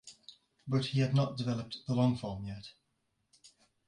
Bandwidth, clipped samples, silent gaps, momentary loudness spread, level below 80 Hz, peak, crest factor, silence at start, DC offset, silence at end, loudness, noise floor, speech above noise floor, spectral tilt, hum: 10.5 kHz; under 0.1%; none; 21 LU; -62 dBFS; -16 dBFS; 20 dB; 0.05 s; under 0.1%; 0.4 s; -33 LUFS; -80 dBFS; 47 dB; -7 dB/octave; none